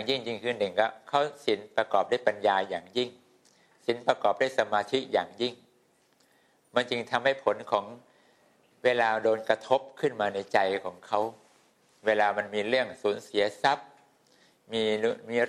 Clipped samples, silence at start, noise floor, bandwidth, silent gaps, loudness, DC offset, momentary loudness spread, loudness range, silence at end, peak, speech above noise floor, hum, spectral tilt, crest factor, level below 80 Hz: under 0.1%; 0 s; -67 dBFS; 12.5 kHz; none; -28 LUFS; under 0.1%; 7 LU; 2 LU; 0 s; -6 dBFS; 39 dB; none; -4 dB/octave; 22 dB; -76 dBFS